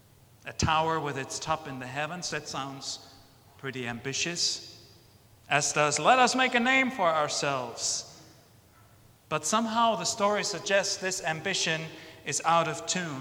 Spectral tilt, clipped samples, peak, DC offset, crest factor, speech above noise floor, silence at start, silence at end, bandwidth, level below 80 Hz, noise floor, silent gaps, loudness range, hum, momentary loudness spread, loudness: -2.5 dB/octave; under 0.1%; -6 dBFS; under 0.1%; 22 dB; 29 dB; 0.45 s; 0 s; 20 kHz; -58 dBFS; -58 dBFS; none; 8 LU; none; 14 LU; -27 LUFS